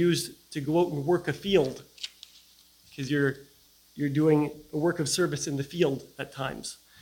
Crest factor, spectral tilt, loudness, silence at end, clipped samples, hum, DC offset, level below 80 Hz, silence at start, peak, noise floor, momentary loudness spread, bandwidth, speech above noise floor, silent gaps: 20 dB; -5 dB/octave; -28 LUFS; 0.25 s; under 0.1%; none; under 0.1%; -60 dBFS; 0 s; -8 dBFS; -58 dBFS; 15 LU; 17.5 kHz; 31 dB; none